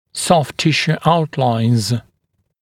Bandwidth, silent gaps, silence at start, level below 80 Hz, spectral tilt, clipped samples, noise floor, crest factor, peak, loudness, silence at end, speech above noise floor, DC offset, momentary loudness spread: 16 kHz; none; 0.15 s; -52 dBFS; -5 dB/octave; under 0.1%; -68 dBFS; 16 dB; 0 dBFS; -16 LUFS; 0.6 s; 52 dB; under 0.1%; 3 LU